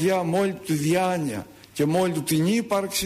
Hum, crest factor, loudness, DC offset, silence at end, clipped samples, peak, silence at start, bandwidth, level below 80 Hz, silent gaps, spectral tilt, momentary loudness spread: none; 12 dB; -24 LUFS; under 0.1%; 0 s; under 0.1%; -12 dBFS; 0 s; 15.5 kHz; -60 dBFS; none; -5 dB/octave; 7 LU